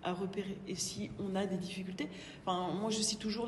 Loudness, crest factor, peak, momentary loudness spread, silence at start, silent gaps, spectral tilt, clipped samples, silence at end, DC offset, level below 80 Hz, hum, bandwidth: -38 LUFS; 16 dB; -22 dBFS; 8 LU; 0 s; none; -4 dB/octave; under 0.1%; 0 s; under 0.1%; -64 dBFS; none; 12.5 kHz